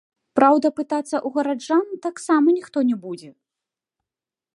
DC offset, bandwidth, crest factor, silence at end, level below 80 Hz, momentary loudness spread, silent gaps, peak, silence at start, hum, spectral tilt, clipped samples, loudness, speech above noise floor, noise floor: under 0.1%; 11.5 kHz; 20 dB; 1.25 s; -74 dBFS; 13 LU; none; -2 dBFS; 0.35 s; none; -5 dB/octave; under 0.1%; -21 LUFS; 69 dB; -89 dBFS